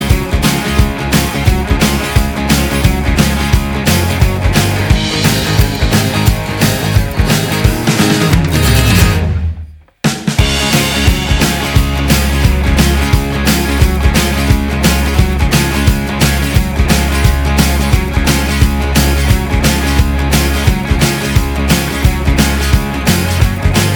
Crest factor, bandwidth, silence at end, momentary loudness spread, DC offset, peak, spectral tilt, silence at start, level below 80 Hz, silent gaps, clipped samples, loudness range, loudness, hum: 12 dB; over 20 kHz; 0 s; 3 LU; under 0.1%; 0 dBFS; -4.5 dB/octave; 0 s; -16 dBFS; none; 0.2%; 1 LU; -12 LUFS; none